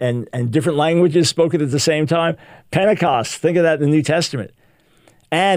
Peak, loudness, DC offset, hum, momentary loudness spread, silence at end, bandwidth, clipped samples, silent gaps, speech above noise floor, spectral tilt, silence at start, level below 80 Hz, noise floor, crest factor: -2 dBFS; -17 LUFS; under 0.1%; none; 8 LU; 0 s; 16 kHz; under 0.1%; none; 37 dB; -5.5 dB/octave; 0 s; -56 dBFS; -54 dBFS; 16 dB